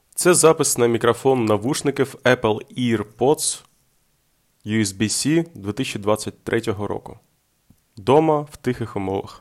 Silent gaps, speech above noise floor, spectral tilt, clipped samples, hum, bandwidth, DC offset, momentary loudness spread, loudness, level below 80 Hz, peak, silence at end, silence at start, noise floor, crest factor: none; 45 dB; -4.5 dB/octave; under 0.1%; none; 16 kHz; under 0.1%; 11 LU; -20 LUFS; -56 dBFS; -2 dBFS; 0.05 s; 0.15 s; -65 dBFS; 18 dB